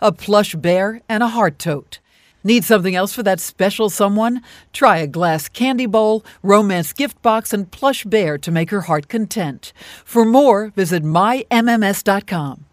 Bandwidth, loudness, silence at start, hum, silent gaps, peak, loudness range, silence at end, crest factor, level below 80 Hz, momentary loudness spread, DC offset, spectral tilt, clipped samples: 16 kHz; -16 LUFS; 0 s; none; none; 0 dBFS; 2 LU; 0.1 s; 16 dB; -56 dBFS; 10 LU; under 0.1%; -5 dB/octave; under 0.1%